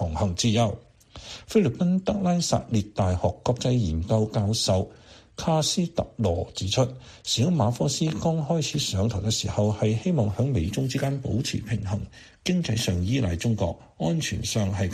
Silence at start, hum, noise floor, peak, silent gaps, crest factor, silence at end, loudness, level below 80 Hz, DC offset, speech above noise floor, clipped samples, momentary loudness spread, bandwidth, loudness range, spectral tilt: 0 s; none; -44 dBFS; -10 dBFS; none; 16 dB; 0 s; -25 LUFS; -44 dBFS; under 0.1%; 19 dB; under 0.1%; 6 LU; 14 kHz; 2 LU; -5.5 dB/octave